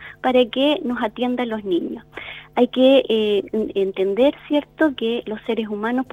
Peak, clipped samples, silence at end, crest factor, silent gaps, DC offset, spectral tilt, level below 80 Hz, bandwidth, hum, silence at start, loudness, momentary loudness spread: -4 dBFS; under 0.1%; 0.1 s; 16 dB; none; under 0.1%; -6.5 dB/octave; -56 dBFS; 10 kHz; none; 0 s; -20 LUFS; 10 LU